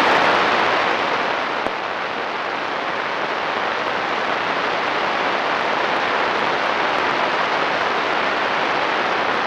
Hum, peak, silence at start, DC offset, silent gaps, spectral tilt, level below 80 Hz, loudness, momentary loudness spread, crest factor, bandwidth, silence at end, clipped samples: none; -6 dBFS; 0 s; under 0.1%; none; -3.5 dB/octave; -58 dBFS; -19 LUFS; 6 LU; 14 dB; 14 kHz; 0 s; under 0.1%